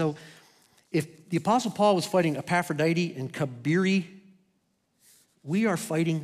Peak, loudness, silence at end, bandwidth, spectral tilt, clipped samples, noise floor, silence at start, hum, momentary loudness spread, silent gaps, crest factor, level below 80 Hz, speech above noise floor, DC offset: -10 dBFS; -27 LUFS; 0 s; 15 kHz; -6 dB/octave; under 0.1%; -73 dBFS; 0 s; none; 8 LU; none; 18 dB; -74 dBFS; 46 dB; under 0.1%